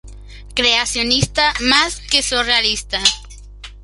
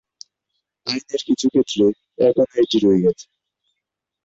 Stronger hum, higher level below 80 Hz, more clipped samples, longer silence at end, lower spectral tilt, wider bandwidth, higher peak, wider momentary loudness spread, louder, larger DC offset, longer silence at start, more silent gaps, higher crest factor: first, 50 Hz at -35 dBFS vs none; first, -36 dBFS vs -56 dBFS; neither; second, 0 s vs 1 s; second, -2 dB/octave vs -5.5 dB/octave; first, 12 kHz vs 8 kHz; first, 0 dBFS vs -4 dBFS; second, 3 LU vs 10 LU; first, -15 LUFS vs -19 LUFS; neither; second, 0.05 s vs 0.85 s; neither; about the same, 18 dB vs 16 dB